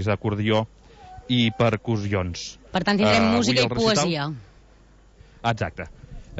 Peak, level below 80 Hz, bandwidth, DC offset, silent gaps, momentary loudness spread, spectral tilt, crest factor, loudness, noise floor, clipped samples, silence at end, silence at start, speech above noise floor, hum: -8 dBFS; -48 dBFS; 8 kHz; under 0.1%; none; 16 LU; -5 dB/octave; 16 dB; -22 LUFS; -52 dBFS; under 0.1%; 0 s; 0 s; 30 dB; none